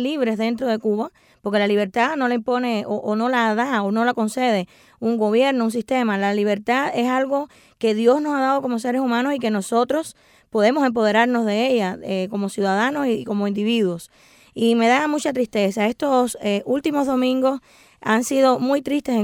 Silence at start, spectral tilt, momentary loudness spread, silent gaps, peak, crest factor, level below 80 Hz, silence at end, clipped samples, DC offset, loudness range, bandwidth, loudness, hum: 0 s; -5 dB/octave; 7 LU; none; -4 dBFS; 16 dB; -64 dBFS; 0 s; under 0.1%; under 0.1%; 1 LU; 16.5 kHz; -20 LUFS; none